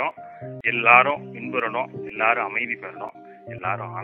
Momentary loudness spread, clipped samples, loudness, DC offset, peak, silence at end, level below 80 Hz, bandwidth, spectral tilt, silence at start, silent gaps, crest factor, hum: 23 LU; under 0.1%; -21 LUFS; under 0.1%; 0 dBFS; 0 s; -68 dBFS; 4.1 kHz; -7.5 dB/octave; 0 s; none; 24 dB; none